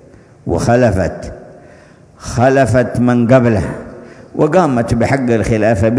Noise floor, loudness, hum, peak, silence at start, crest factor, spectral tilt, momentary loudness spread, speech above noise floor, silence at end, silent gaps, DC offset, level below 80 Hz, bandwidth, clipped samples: -42 dBFS; -13 LUFS; none; 0 dBFS; 0.45 s; 14 dB; -7.5 dB/octave; 18 LU; 30 dB; 0 s; none; under 0.1%; -34 dBFS; 11 kHz; under 0.1%